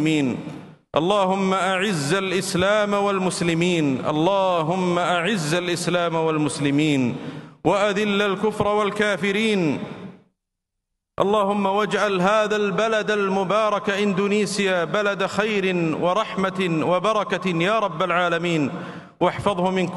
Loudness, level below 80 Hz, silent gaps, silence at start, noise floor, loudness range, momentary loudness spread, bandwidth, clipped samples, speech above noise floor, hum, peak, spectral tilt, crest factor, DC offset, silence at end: -21 LUFS; -58 dBFS; none; 0 s; -81 dBFS; 2 LU; 4 LU; 12.5 kHz; under 0.1%; 60 dB; none; -4 dBFS; -5 dB/octave; 18 dB; under 0.1%; 0 s